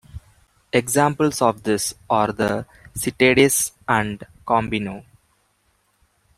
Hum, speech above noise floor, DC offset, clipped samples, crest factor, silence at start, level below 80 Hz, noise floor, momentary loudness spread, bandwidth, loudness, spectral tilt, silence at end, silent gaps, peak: none; 45 dB; under 0.1%; under 0.1%; 20 dB; 0.15 s; -50 dBFS; -65 dBFS; 13 LU; 16 kHz; -20 LUFS; -4 dB/octave; 1.35 s; none; -2 dBFS